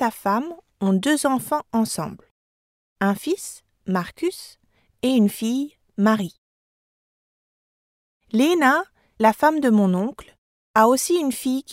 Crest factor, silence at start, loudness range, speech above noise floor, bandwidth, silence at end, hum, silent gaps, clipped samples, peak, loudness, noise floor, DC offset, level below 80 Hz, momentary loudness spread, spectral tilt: 20 dB; 0 s; 7 LU; over 70 dB; 16 kHz; 0 s; none; 2.31-2.96 s, 6.38-8.20 s, 10.38-10.74 s; under 0.1%; -2 dBFS; -21 LUFS; under -90 dBFS; under 0.1%; -62 dBFS; 12 LU; -5 dB/octave